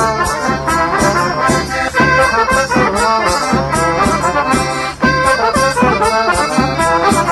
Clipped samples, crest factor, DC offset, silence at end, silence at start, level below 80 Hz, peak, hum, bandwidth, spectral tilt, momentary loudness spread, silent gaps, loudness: under 0.1%; 12 dB; under 0.1%; 0 s; 0 s; -30 dBFS; 0 dBFS; none; 14 kHz; -4 dB/octave; 3 LU; none; -13 LUFS